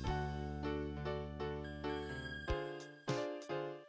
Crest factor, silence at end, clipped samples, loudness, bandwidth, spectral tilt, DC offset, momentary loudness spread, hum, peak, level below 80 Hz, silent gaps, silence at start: 18 dB; 0 s; under 0.1%; -43 LUFS; 8 kHz; -6.5 dB/octave; under 0.1%; 3 LU; none; -24 dBFS; -50 dBFS; none; 0 s